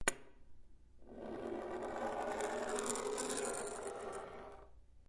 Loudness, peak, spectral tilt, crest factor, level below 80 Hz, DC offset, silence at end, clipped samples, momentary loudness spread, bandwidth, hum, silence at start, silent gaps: -42 LUFS; -14 dBFS; -2.5 dB/octave; 28 dB; -64 dBFS; under 0.1%; 0.05 s; under 0.1%; 15 LU; 11.5 kHz; none; 0 s; none